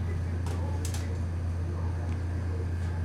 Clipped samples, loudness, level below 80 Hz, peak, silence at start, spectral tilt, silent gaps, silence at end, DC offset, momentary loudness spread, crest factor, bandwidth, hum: under 0.1%; -33 LUFS; -38 dBFS; -20 dBFS; 0 s; -6.5 dB/octave; none; 0 s; under 0.1%; 1 LU; 10 dB; 12 kHz; none